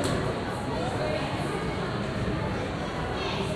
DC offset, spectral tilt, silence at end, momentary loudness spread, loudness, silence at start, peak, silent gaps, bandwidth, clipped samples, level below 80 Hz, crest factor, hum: under 0.1%; -5.5 dB/octave; 0 s; 2 LU; -30 LUFS; 0 s; -14 dBFS; none; 14 kHz; under 0.1%; -42 dBFS; 16 dB; none